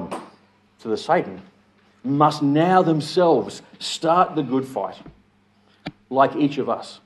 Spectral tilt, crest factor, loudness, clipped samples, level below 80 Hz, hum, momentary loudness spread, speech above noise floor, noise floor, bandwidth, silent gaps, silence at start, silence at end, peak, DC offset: -6 dB/octave; 20 dB; -21 LUFS; under 0.1%; -64 dBFS; none; 18 LU; 39 dB; -59 dBFS; 12.5 kHz; none; 0 s; 0.1 s; -2 dBFS; under 0.1%